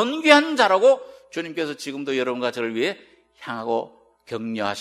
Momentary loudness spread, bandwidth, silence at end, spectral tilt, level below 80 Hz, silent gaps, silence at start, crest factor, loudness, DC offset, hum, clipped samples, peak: 18 LU; 14 kHz; 0 s; -3.5 dB/octave; -70 dBFS; none; 0 s; 22 dB; -21 LUFS; under 0.1%; none; under 0.1%; 0 dBFS